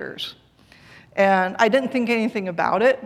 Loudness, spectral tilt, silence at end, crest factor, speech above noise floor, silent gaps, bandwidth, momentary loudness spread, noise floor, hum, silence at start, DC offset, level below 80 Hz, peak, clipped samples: -20 LUFS; -5.5 dB/octave; 0 s; 20 dB; 33 dB; none; 14.5 kHz; 13 LU; -52 dBFS; none; 0 s; under 0.1%; -64 dBFS; -2 dBFS; under 0.1%